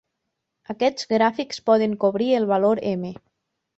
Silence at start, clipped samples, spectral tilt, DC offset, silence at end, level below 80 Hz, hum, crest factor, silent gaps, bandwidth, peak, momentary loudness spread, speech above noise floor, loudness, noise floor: 0.7 s; under 0.1%; -5.5 dB/octave; under 0.1%; 0.65 s; -64 dBFS; none; 18 dB; none; 8 kHz; -6 dBFS; 9 LU; 58 dB; -21 LUFS; -79 dBFS